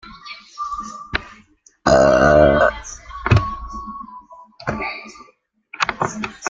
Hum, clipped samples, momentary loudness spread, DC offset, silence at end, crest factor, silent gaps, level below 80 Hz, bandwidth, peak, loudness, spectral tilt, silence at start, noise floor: none; under 0.1%; 22 LU; under 0.1%; 0 s; 18 dB; none; -36 dBFS; 7.8 kHz; 0 dBFS; -18 LUFS; -5.5 dB/octave; 0.05 s; -56 dBFS